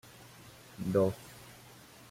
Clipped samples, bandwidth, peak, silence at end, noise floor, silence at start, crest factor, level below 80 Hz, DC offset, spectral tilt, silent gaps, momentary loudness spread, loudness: under 0.1%; 16.5 kHz; -16 dBFS; 0.55 s; -55 dBFS; 0.25 s; 20 dB; -64 dBFS; under 0.1%; -7 dB/octave; none; 23 LU; -32 LUFS